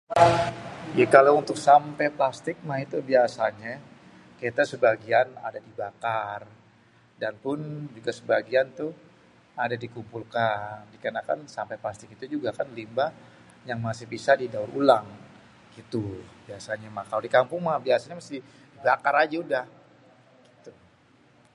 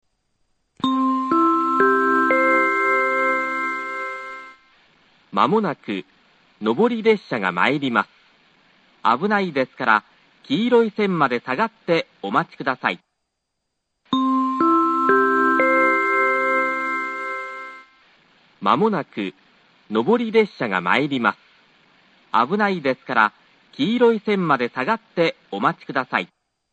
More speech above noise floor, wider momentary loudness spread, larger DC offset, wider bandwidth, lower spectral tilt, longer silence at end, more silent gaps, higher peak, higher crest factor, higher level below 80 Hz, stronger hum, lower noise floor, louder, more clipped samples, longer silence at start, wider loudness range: second, 33 dB vs 57 dB; first, 18 LU vs 10 LU; neither; first, 11.5 kHz vs 8.8 kHz; about the same, -5.5 dB/octave vs -6.5 dB/octave; first, 0.85 s vs 0.45 s; neither; about the same, -2 dBFS vs 0 dBFS; first, 26 dB vs 20 dB; first, -62 dBFS vs -68 dBFS; neither; second, -59 dBFS vs -77 dBFS; second, -25 LUFS vs -20 LUFS; neither; second, 0.1 s vs 0.85 s; first, 9 LU vs 5 LU